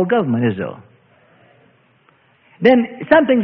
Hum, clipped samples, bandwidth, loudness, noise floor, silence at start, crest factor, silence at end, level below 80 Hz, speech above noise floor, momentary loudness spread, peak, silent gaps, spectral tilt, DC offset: none; under 0.1%; 5.6 kHz; -16 LUFS; -55 dBFS; 0 s; 18 dB; 0 s; -58 dBFS; 40 dB; 11 LU; 0 dBFS; none; -9 dB/octave; under 0.1%